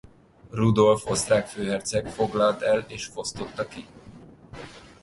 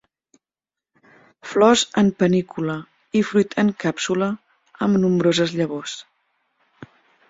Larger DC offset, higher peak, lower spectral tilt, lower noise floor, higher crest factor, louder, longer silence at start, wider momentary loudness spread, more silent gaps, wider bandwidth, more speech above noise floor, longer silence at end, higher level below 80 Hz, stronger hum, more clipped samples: neither; second, -6 dBFS vs -2 dBFS; about the same, -5 dB/octave vs -5 dB/octave; second, -47 dBFS vs -89 dBFS; about the same, 20 dB vs 20 dB; second, -25 LUFS vs -20 LUFS; second, 0.5 s vs 1.45 s; first, 22 LU vs 14 LU; neither; first, 11.5 kHz vs 8 kHz; second, 23 dB vs 70 dB; second, 0.25 s vs 0.45 s; first, -52 dBFS vs -60 dBFS; neither; neither